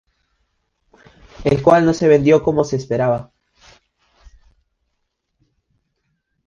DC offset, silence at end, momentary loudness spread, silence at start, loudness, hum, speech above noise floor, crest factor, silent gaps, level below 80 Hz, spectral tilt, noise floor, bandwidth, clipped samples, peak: under 0.1%; 3.25 s; 8 LU; 1.4 s; -16 LUFS; none; 58 dB; 20 dB; none; -46 dBFS; -7 dB/octave; -73 dBFS; 7.4 kHz; under 0.1%; 0 dBFS